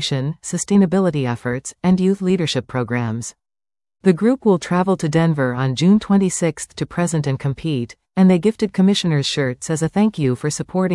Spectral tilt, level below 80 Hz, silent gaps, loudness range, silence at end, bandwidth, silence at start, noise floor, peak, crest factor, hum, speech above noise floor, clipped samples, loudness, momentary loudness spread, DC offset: -6 dB/octave; -52 dBFS; none; 2 LU; 0 s; 12 kHz; 0 s; under -90 dBFS; -2 dBFS; 16 dB; none; over 72 dB; under 0.1%; -18 LUFS; 9 LU; under 0.1%